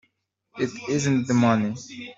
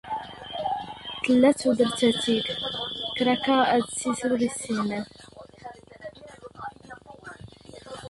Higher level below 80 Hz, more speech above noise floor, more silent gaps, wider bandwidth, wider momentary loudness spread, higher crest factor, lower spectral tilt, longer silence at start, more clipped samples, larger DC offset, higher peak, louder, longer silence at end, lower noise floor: about the same, -62 dBFS vs -60 dBFS; first, 49 dB vs 23 dB; neither; second, 7.8 kHz vs 11.5 kHz; second, 10 LU vs 24 LU; about the same, 20 dB vs 18 dB; first, -6 dB/octave vs -4 dB/octave; first, 0.55 s vs 0.05 s; neither; neither; about the same, -6 dBFS vs -8 dBFS; about the same, -23 LUFS vs -25 LUFS; about the same, 0.05 s vs 0 s; first, -73 dBFS vs -46 dBFS